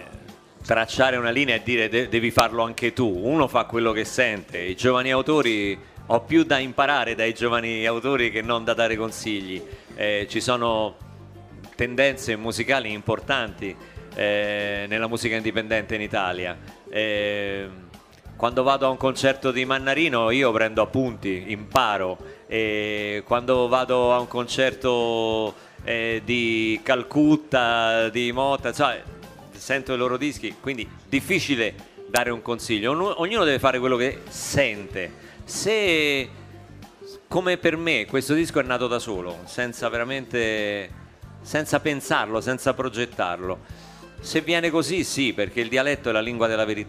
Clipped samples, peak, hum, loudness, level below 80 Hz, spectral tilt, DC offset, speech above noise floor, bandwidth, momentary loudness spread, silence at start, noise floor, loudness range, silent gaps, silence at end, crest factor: under 0.1%; 0 dBFS; none; -23 LUFS; -50 dBFS; -4.5 dB/octave; under 0.1%; 22 dB; 15.5 kHz; 11 LU; 0 s; -45 dBFS; 4 LU; none; 0 s; 24 dB